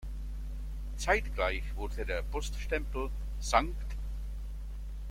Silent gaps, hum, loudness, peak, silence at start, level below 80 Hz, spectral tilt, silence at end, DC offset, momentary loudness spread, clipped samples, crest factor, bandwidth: none; none; -35 LUFS; -10 dBFS; 0 s; -36 dBFS; -4.5 dB/octave; 0 s; under 0.1%; 13 LU; under 0.1%; 24 dB; 15 kHz